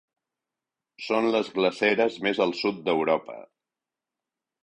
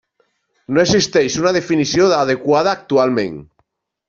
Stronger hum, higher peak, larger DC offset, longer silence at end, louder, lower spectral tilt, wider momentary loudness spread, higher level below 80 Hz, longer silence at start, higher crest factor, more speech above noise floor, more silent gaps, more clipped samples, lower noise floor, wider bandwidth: neither; second, -8 dBFS vs -2 dBFS; neither; first, 1.2 s vs 0.65 s; second, -25 LUFS vs -15 LUFS; about the same, -5 dB/octave vs -4.5 dB/octave; first, 10 LU vs 6 LU; second, -70 dBFS vs -52 dBFS; first, 1 s vs 0.7 s; first, 20 dB vs 14 dB; first, 64 dB vs 50 dB; neither; neither; first, -89 dBFS vs -65 dBFS; first, 10 kHz vs 7.6 kHz